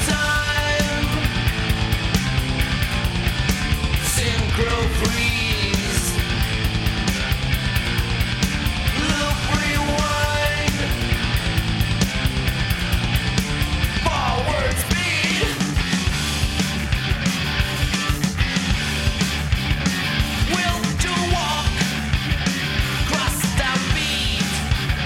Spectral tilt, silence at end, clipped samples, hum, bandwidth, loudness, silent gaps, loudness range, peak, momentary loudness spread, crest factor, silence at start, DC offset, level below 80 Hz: -4 dB/octave; 0 s; under 0.1%; none; 17 kHz; -21 LUFS; none; 1 LU; -4 dBFS; 2 LU; 16 dB; 0 s; under 0.1%; -26 dBFS